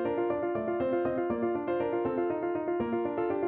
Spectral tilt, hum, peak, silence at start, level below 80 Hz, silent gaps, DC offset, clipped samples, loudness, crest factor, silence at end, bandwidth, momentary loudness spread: -10.5 dB/octave; none; -18 dBFS; 0 s; -62 dBFS; none; under 0.1%; under 0.1%; -31 LUFS; 12 dB; 0 s; 3.9 kHz; 2 LU